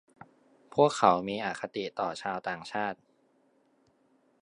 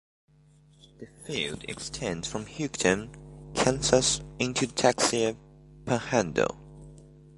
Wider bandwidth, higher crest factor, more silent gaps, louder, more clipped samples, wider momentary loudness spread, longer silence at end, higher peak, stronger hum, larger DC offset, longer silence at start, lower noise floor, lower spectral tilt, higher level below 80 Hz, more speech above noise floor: about the same, 10.5 kHz vs 11.5 kHz; about the same, 26 dB vs 26 dB; neither; second, -30 LUFS vs -27 LUFS; neither; second, 12 LU vs 21 LU; first, 1.5 s vs 0.3 s; about the same, -6 dBFS vs -4 dBFS; neither; neither; second, 0.75 s vs 1 s; first, -68 dBFS vs -59 dBFS; first, -5 dB/octave vs -3.5 dB/octave; second, -72 dBFS vs -52 dBFS; first, 39 dB vs 31 dB